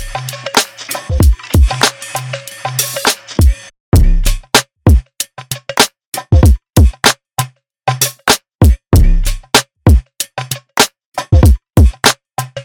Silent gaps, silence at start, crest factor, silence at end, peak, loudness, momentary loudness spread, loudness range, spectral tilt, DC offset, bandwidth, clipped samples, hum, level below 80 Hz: 3.80-3.92 s, 6.06-6.12 s, 8.55-8.59 s, 11.06-11.12 s; 0 s; 12 dB; 0 s; 0 dBFS; -13 LUFS; 13 LU; 2 LU; -4 dB/octave; under 0.1%; over 20 kHz; under 0.1%; none; -16 dBFS